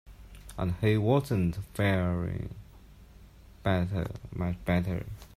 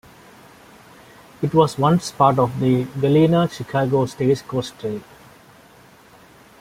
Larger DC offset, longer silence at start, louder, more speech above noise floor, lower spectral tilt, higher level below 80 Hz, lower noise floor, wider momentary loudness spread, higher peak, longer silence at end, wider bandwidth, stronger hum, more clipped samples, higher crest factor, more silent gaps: neither; second, 0.05 s vs 1.4 s; second, -30 LUFS vs -19 LUFS; second, 23 dB vs 30 dB; about the same, -7.5 dB/octave vs -7 dB/octave; first, -48 dBFS vs -54 dBFS; about the same, -52 dBFS vs -49 dBFS; about the same, 12 LU vs 11 LU; second, -12 dBFS vs 0 dBFS; second, 0.1 s vs 1.6 s; about the same, 15.5 kHz vs 16 kHz; neither; neither; about the same, 18 dB vs 20 dB; neither